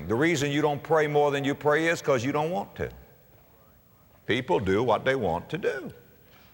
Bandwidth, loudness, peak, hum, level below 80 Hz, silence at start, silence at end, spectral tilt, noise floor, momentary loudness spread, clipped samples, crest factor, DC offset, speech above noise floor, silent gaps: 16.5 kHz; -26 LUFS; -10 dBFS; none; -56 dBFS; 0 s; 0.6 s; -5.5 dB/octave; -58 dBFS; 12 LU; under 0.1%; 16 dB; under 0.1%; 32 dB; none